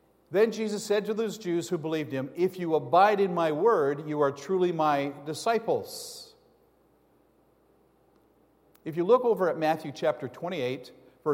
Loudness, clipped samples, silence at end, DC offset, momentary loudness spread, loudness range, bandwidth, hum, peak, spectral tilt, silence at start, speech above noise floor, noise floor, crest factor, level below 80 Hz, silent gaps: -27 LUFS; under 0.1%; 0 s; under 0.1%; 12 LU; 9 LU; 16.5 kHz; none; -10 dBFS; -5.5 dB/octave; 0.3 s; 38 dB; -64 dBFS; 20 dB; -76 dBFS; none